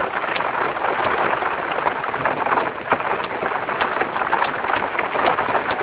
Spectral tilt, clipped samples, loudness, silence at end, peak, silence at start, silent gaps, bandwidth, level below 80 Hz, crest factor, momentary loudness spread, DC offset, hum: -7.5 dB/octave; under 0.1%; -21 LUFS; 0 s; -2 dBFS; 0 s; none; 4 kHz; -54 dBFS; 18 dB; 3 LU; under 0.1%; none